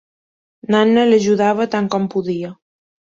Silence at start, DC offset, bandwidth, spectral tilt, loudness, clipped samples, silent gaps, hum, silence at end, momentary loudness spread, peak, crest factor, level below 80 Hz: 0.7 s; under 0.1%; 7.6 kHz; -6 dB/octave; -16 LUFS; under 0.1%; none; none; 0.55 s; 13 LU; -2 dBFS; 16 dB; -60 dBFS